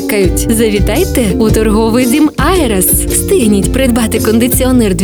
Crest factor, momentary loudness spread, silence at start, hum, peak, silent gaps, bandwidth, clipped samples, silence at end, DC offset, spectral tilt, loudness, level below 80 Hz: 10 dB; 2 LU; 0 s; none; 0 dBFS; none; over 20 kHz; under 0.1%; 0 s; under 0.1%; -5 dB/octave; -10 LUFS; -20 dBFS